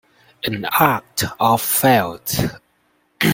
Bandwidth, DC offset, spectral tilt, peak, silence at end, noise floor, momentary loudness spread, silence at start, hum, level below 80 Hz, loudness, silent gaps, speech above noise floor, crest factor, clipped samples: 17 kHz; under 0.1%; -4 dB/octave; 0 dBFS; 0 s; -62 dBFS; 10 LU; 0.45 s; none; -48 dBFS; -18 LUFS; none; 44 dB; 20 dB; under 0.1%